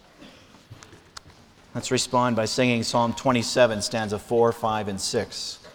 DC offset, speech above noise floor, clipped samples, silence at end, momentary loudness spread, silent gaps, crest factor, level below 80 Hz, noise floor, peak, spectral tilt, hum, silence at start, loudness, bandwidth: under 0.1%; 28 dB; under 0.1%; 0 s; 15 LU; none; 18 dB; -56 dBFS; -52 dBFS; -6 dBFS; -4 dB/octave; none; 0.2 s; -24 LUFS; 19 kHz